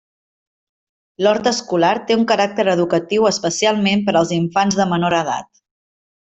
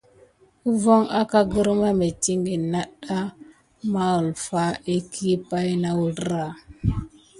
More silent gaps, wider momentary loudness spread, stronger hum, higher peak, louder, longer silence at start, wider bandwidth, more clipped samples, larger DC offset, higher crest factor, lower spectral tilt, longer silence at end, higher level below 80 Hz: neither; second, 3 LU vs 10 LU; neither; about the same, -2 dBFS vs -4 dBFS; first, -17 LUFS vs -23 LUFS; first, 1.2 s vs 0.65 s; second, 8.2 kHz vs 11.5 kHz; neither; neither; about the same, 16 dB vs 20 dB; second, -4.5 dB/octave vs -6 dB/octave; first, 0.9 s vs 0.3 s; second, -58 dBFS vs -44 dBFS